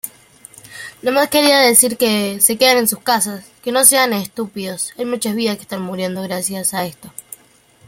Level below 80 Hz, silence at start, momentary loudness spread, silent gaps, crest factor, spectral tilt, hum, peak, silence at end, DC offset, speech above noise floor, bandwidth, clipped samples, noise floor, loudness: -62 dBFS; 0.05 s; 18 LU; none; 18 dB; -2 dB/octave; none; 0 dBFS; 0.8 s; under 0.1%; 34 dB; 17 kHz; under 0.1%; -51 dBFS; -15 LUFS